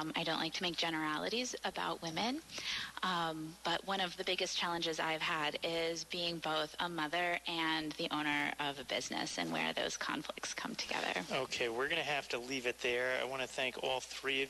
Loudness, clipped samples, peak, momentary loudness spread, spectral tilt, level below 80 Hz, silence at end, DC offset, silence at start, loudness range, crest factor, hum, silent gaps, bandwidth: -37 LUFS; under 0.1%; -22 dBFS; 4 LU; -2.5 dB/octave; -70 dBFS; 0 s; under 0.1%; 0 s; 1 LU; 16 dB; none; none; 12.5 kHz